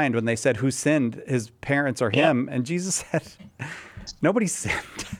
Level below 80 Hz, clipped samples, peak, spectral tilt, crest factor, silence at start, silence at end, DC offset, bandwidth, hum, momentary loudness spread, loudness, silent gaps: -54 dBFS; under 0.1%; -6 dBFS; -5 dB/octave; 18 dB; 0 s; 0 s; under 0.1%; 16 kHz; none; 15 LU; -24 LUFS; none